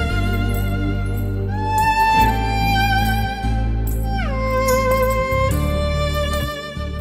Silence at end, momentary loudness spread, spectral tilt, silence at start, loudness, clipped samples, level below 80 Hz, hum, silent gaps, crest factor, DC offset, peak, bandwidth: 0 s; 7 LU; -5.5 dB/octave; 0 s; -19 LUFS; under 0.1%; -24 dBFS; none; none; 14 dB; under 0.1%; -4 dBFS; 16 kHz